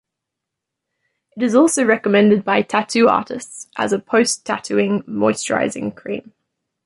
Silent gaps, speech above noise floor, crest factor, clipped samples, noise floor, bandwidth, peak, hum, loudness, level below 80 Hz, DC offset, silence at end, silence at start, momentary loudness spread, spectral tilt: none; 64 dB; 16 dB; under 0.1%; -82 dBFS; 11.5 kHz; -2 dBFS; none; -17 LUFS; -62 dBFS; under 0.1%; 0.65 s; 1.35 s; 15 LU; -4.5 dB/octave